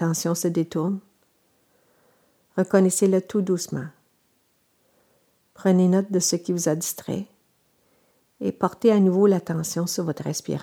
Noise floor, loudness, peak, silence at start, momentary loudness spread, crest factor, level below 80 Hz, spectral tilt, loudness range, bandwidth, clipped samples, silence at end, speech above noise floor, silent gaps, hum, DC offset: -67 dBFS; -23 LUFS; -4 dBFS; 0 s; 13 LU; 20 dB; -70 dBFS; -5.5 dB/octave; 1 LU; 17.5 kHz; under 0.1%; 0 s; 45 dB; none; none; under 0.1%